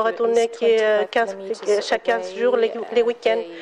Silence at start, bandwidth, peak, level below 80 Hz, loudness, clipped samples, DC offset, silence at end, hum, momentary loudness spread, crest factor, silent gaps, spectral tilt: 0 s; 11 kHz; -8 dBFS; -70 dBFS; -21 LUFS; under 0.1%; under 0.1%; 0 s; none; 4 LU; 12 dB; none; -3 dB/octave